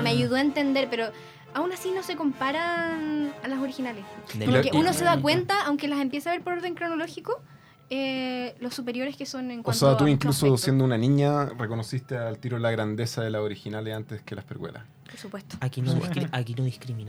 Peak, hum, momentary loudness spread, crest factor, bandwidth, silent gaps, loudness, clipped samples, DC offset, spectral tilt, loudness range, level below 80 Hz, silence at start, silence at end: -6 dBFS; none; 14 LU; 20 dB; over 20 kHz; none; -26 LUFS; under 0.1%; under 0.1%; -5.5 dB/octave; 8 LU; -64 dBFS; 0 s; 0 s